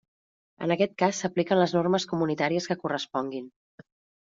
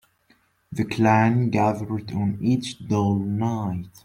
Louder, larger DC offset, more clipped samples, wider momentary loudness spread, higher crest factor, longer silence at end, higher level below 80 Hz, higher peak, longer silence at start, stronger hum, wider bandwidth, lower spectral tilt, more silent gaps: second, -27 LUFS vs -23 LUFS; neither; neither; about the same, 10 LU vs 10 LU; about the same, 18 dB vs 18 dB; first, 0.8 s vs 0.15 s; second, -70 dBFS vs -56 dBFS; second, -10 dBFS vs -4 dBFS; about the same, 0.6 s vs 0.7 s; neither; second, 7.8 kHz vs 15 kHz; second, -4.5 dB/octave vs -7.5 dB/octave; neither